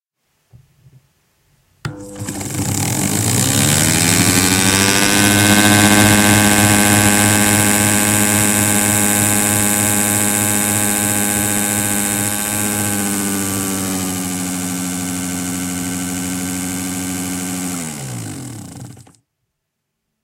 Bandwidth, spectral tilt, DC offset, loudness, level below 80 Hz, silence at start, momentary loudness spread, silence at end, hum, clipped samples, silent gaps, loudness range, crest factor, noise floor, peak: 17 kHz; -3 dB/octave; under 0.1%; -14 LUFS; -42 dBFS; 1.85 s; 13 LU; 1.2 s; none; under 0.1%; none; 12 LU; 16 dB; -75 dBFS; 0 dBFS